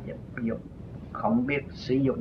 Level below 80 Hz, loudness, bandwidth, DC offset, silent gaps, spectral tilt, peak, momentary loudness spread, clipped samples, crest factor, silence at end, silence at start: -50 dBFS; -30 LUFS; 6.6 kHz; under 0.1%; none; -8 dB/octave; -12 dBFS; 14 LU; under 0.1%; 16 dB; 0 s; 0 s